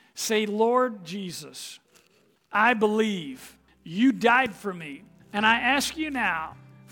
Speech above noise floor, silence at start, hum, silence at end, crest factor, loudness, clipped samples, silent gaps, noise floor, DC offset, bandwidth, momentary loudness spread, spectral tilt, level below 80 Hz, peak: 39 dB; 0.15 s; none; 0.35 s; 20 dB; -24 LUFS; under 0.1%; none; -64 dBFS; under 0.1%; 19.5 kHz; 18 LU; -3.5 dB/octave; -62 dBFS; -6 dBFS